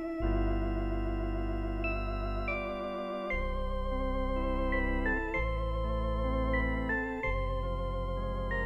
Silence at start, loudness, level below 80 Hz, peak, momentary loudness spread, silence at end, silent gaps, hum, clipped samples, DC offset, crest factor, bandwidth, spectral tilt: 0 s; -34 LUFS; -34 dBFS; -18 dBFS; 5 LU; 0 s; none; none; under 0.1%; under 0.1%; 14 dB; 5.6 kHz; -8 dB/octave